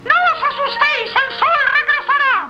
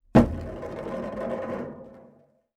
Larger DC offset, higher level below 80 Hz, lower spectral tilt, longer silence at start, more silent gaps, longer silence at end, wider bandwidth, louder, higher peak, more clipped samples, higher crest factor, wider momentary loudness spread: neither; second, -56 dBFS vs -42 dBFS; second, -2 dB/octave vs -8.5 dB/octave; second, 0 s vs 0.15 s; neither; second, 0 s vs 0.55 s; second, 8.6 kHz vs 11 kHz; first, -14 LUFS vs -29 LUFS; first, 0 dBFS vs -4 dBFS; neither; second, 14 dB vs 24 dB; second, 4 LU vs 19 LU